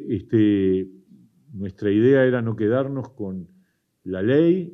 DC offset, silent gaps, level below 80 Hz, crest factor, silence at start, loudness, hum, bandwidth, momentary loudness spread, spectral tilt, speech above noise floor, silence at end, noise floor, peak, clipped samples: under 0.1%; none; -64 dBFS; 16 dB; 0 s; -21 LUFS; none; 3.9 kHz; 18 LU; -10 dB/octave; 42 dB; 0 s; -62 dBFS; -6 dBFS; under 0.1%